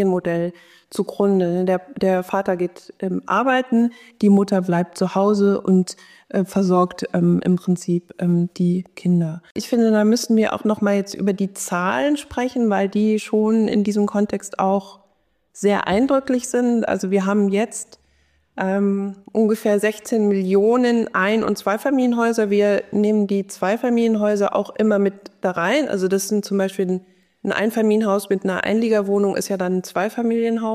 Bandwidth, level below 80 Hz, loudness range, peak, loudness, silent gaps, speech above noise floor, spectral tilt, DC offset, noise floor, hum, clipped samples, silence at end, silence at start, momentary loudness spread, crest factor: 15 kHz; -60 dBFS; 2 LU; -6 dBFS; -20 LUFS; 9.51-9.55 s; 46 dB; -6 dB/octave; under 0.1%; -65 dBFS; none; under 0.1%; 0 s; 0 s; 7 LU; 12 dB